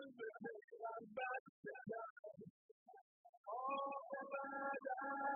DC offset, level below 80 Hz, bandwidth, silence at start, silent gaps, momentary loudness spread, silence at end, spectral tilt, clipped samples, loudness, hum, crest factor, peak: under 0.1%; under -90 dBFS; 2.8 kHz; 0 s; 0.64-0.68 s, 1.40-1.63 s, 2.10-2.23 s, 2.50-2.86 s, 3.01-3.44 s; 17 LU; 0 s; 1.5 dB/octave; under 0.1%; -48 LUFS; none; 18 dB; -30 dBFS